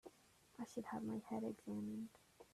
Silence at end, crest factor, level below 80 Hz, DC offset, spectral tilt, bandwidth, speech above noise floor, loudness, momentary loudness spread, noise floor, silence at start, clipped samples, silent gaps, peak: 0.1 s; 16 dB; -82 dBFS; under 0.1%; -6.5 dB/octave; 14 kHz; 24 dB; -49 LUFS; 18 LU; -71 dBFS; 0.05 s; under 0.1%; none; -32 dBFS